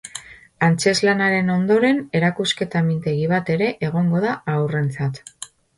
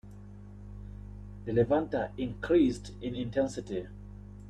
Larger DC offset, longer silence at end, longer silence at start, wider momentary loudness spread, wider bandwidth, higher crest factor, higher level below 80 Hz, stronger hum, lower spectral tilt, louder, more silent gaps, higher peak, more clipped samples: neither; first, 0.3 s vs 0 s; about the same, 0.05 s vs 0.05 s; second, 10 LU vs 22 LU; first, 11.5 kHz vs 10 kHz; about the same, 16 dB vs 18 dB; second, -56 dBFS vs -50 dBFS; second, none vs 50 Hz at -45 dBFS; second, -5.5 dB/octave vs -7 dB/octave; first, -20 LUFS vs -31 LUFS; neither; first, -4 dBFS vs -14 dBFS; neither